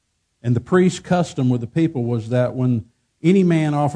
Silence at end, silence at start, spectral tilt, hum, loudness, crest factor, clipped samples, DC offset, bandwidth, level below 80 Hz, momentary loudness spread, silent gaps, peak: 0 s; 0.45 s; -7.5 dB/octave; none; -19 LUFS; 16 dB; under 0.1%; under 0.1%; 10 kHz; -56 dBFS; 7 LU; none; -4 dBFS